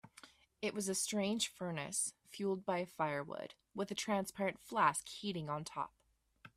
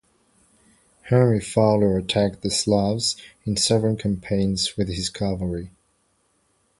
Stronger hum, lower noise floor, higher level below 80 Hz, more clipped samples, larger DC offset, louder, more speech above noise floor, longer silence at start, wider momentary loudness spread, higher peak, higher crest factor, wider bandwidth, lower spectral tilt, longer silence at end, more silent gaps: neither; about the same, -64 dBFS vs -67 dBFS; second, -76 dBFS vs -44 dBFS; neither; neither; second, -39 LUFS vs -22 LUFS; second, 25 dB vs 45 dB; second, 0.05 s vs 1.05 s; about the same, 11 LU vs 9 LU; second, -16 dBFS vs -4 dBFS; first, 24 dB vs 18 dB; first, 15.5 kHz vs 11.5 kHz; second, -3.5 dB/octave vs -5 dB/octave; second, 0.1 s vs 1.1 s; neither